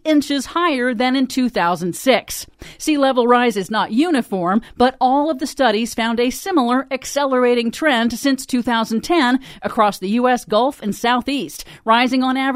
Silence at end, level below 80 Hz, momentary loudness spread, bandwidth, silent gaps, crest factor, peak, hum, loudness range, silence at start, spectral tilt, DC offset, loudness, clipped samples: 0 s; -50 dBFS; 6 LU; 16 kHz; none; 16 dB; 0 dBFS; none; 1 LU; 0.05 s; -4 dB/octave; under 0.1%; -18 LUFS; under 0.1%